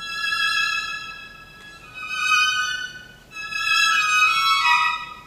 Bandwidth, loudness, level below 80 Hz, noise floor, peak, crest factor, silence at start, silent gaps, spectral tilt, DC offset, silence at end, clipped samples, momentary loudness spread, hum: 16 kHz; -19 LUFS; -56 dBFS; -43 dBFS; -4 dBFS; 18 dB; 0 s; none; 1.5 dB/octave; under 0.1%; 0 s; under 0.1%; 18 LU; none